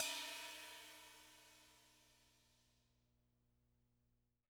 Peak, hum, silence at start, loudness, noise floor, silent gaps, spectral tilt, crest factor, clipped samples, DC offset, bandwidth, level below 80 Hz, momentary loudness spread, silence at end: -24 dBFS; 60 Hz at -80 dBFS; 0 s; -50 LUFS; -84 dBFS; none; 0.5 dB/octave; 32 dB; under 0.1%; under 0.1%; over 20 kHz; -84 dBFS; 22 LU; 2 s